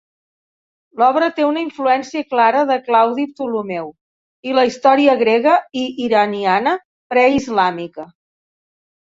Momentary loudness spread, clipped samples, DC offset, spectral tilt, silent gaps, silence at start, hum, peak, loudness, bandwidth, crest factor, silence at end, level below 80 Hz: 13 LU; under 0.1%; under 0.1%; -5 dB/octave; 4.01-4.43 s, 6.85-7.10 s; 0.95 s; none; 0 dBFS; -16 LUFS; 7.8 kHz; 16 dB; 0.95 s; -58 dBFS